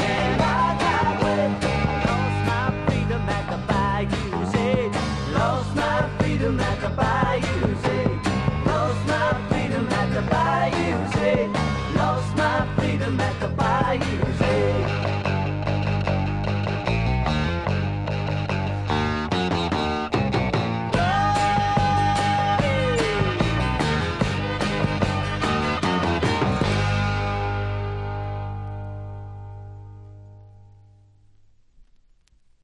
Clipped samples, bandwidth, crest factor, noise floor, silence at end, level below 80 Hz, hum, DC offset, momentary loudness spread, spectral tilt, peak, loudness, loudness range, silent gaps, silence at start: under 0.1%; 11.5 kHz; 18 dB; -58 dBFS; 2 s; -36 dBFS; 50 Hz at -40 dBFS; under 0.1%; 5 LU; -6.5 dB/octave; -6 dBFS; -23 LUFS; 4 LU; none; 0 s